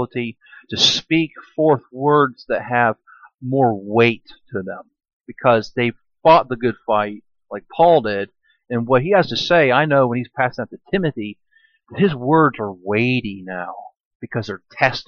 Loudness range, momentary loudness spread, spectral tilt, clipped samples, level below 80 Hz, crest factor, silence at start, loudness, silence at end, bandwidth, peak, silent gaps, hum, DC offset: 3 LU; 17 LU; -5.5 dB/octave; under 0.1%; -56 dBFS; 18 dB; 0 s; -18 LUFS; 0.05 s; 7.2 kHz; -2 dBFS; 5.13-5.20 s, 14.00-14.20 s; none; under 0.1%